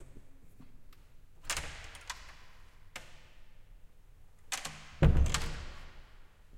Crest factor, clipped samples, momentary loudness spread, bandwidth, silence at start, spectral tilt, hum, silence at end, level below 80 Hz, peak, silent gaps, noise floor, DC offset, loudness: 24 dB; under 0.1%; 27 LU; 16.5 kHz; 0 s; -4.5 dB/octave; none; 0 s; -40 dBFS; -12 dBFS; none; -55 dBFS; under 0.1%; -35 LUFS